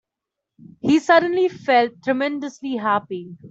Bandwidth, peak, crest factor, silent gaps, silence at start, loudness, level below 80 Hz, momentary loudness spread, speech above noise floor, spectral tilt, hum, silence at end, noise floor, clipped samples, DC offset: 8 kHz; -2 dBFS; 18 dB; none; 0.85 s; -20 LUFS; -66 dBFS; 13 LU; 64 dB; -5 dB/octave; none; 0 s; -84 dBFS; under 0.1%; under 0.1%